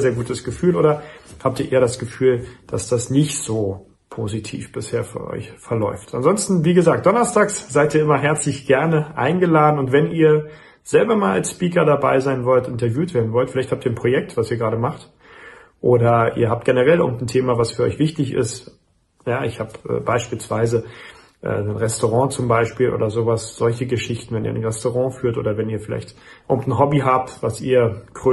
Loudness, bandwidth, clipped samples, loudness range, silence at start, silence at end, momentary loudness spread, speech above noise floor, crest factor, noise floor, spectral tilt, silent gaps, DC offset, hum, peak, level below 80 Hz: -19 LUFS; 12 kHz; under 0.1%; 6 LU; 0 s; 0 s; 11 LU; 24 dB; 16 dB; -43 dBFS; -6 dB/octave; none; under 0.1%; none; -2 dBFS; -50 dBFS